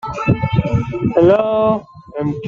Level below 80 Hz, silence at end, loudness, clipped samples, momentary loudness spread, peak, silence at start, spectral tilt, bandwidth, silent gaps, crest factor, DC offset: -38 dBFS; 0 s; -16 LUFS; under 0.1%; 10 LU; -2 dBFS; 0.05 s; -9 dB/octave; 7.4 kHz; none; 14 dB; under 0.1%